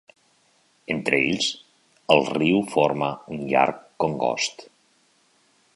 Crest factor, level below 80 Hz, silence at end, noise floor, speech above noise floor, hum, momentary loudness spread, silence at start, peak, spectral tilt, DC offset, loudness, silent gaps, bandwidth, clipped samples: 24 dB; -62 dBFS; 1.1 s; -63 dBFS; 40 dB; none; 10 LU; 0.9 s; 0 dBFS; -4 dB/octave; under 0.1%; -23 LUFS; none; 11.5 kHz; under 0.1%